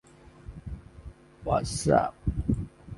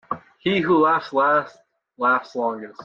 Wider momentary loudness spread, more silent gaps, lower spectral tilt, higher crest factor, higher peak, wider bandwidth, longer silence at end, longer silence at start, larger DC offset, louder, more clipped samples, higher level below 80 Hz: first, 24 LU vs 9 LU; neither; about the same, -6 dB/octave vs -7 dB/octave; first, 22 dB vs 14 dB; about the same, -8 dBFS vs -8 dBFS; first, 11.5 kHz vs 7.2 kHz; about the same, 0 s vs 0 s; first, 0.25 s vs 0.1 s; neither; second, -28 LUFS vs -21 LUFS; neither; first, -40 dBFS vs -64 dBFS